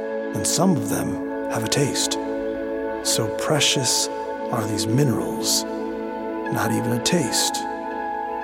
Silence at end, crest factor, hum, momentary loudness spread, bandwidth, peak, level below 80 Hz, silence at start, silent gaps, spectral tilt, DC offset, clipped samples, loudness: 0 s; 18 dB; none; 9 LU; 16.5 kHz; -4 dBFS; -54 dBFS; 0 s; none; -3.5 dB/octave; under 0.1%; under 0.1%; -22 LUFS